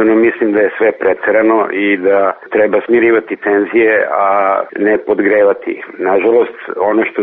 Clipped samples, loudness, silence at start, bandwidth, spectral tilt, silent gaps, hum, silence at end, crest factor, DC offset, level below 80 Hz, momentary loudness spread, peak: under 0.1%; -12 LUFS; 0 s; 3.9 kHz; -4 dB/octave; none; none; 0 s; 10 dB; under 0.1%; -54 dBFS; 4 LU; -2 dBFS